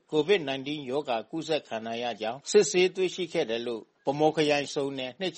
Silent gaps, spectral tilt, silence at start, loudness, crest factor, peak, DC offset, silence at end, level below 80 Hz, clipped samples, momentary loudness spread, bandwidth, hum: none; -4 dB/octave; 0.1 s; -28 LUFS; 18 dB; -10 dBFS; under 0.1%; 0 s; -72 dBFS; under 0.1%; 9 LU; 8.8 kHz; none